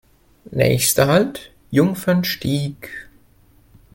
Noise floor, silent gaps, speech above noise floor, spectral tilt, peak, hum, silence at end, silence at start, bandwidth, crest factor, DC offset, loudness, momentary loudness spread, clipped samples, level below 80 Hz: -53 dBFS; none; 35 dB; -5 dB/octave; 0 dBFS; none; 0.9 s; 0.5 s; 17 kHz; 20 dB; under 0.1%; -18 LUFS; 19 LU; under 0.1%; -48 dBFS